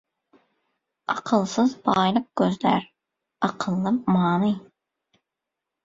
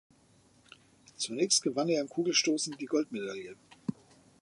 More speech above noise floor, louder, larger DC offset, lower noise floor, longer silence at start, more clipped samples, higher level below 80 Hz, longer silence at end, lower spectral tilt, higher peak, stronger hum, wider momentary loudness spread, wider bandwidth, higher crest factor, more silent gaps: first, 63 dB vs 33 dB; first, -23 LUFS vs -31 LUFS; neither; first, -85 dBFS vs -64 dBFS; about the same, 1.1 s vs 1.2 s; neither; first, -62 dBFS vs -78 dBFS; first, 1.25 s vs 0.5 s; first, -6.5 dB/octave vs -2.5 dB/octave; first, -6 dBFS vs -12 dBFS; neither; second, 8 LU vs 14 LU; second, 7.8 kHz vs 11.5 kHz; about the same, 20 dB vs 22 dB; neither